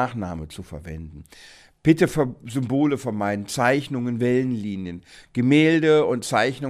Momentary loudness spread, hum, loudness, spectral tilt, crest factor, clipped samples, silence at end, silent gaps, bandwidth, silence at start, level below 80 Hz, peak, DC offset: 19 LU; none; -22 LUFS; -6 dB/octave; 18 dB; under 0.1%; 0 s; none; 15 kHz; 0 s; -50 dBFS; -4 dBFS; under 0.1%